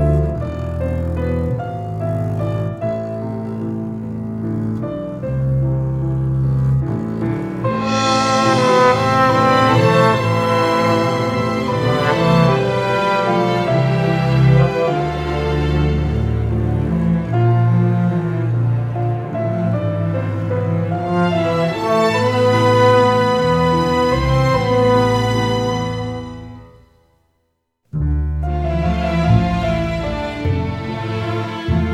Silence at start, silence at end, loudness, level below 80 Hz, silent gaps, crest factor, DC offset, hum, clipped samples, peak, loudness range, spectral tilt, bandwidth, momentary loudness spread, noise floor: 0 s; 0 s; -17 LUFS; -32 dBFS; none; 16 dB; under 0.1%; none; under 0.1%; -2 dBFS; 8 LU; -7 dB/octave; 13 kHz; 10 LU; -68 dBFS